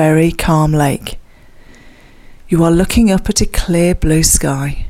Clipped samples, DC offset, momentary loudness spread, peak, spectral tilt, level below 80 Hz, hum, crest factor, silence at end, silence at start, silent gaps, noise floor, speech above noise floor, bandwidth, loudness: under 0.1%; under 0.1%; 7 LU; 0 dBFS; -5 dB/octave; -24 dBFS; none; 14 dB; 0 s; 0 s; none; -39 dBFS; 27 dB; 16 kHz; -13 LUFS